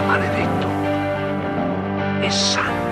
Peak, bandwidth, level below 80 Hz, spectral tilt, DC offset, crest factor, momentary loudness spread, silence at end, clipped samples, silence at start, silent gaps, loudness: -6 dBFS; 13.5 kHz; -48 dBFS; -4.5 dB/octave; under 0.1%; 14 dB; 5 LU; 0 s; under 0.1%; 0 s; none; -20 LUFS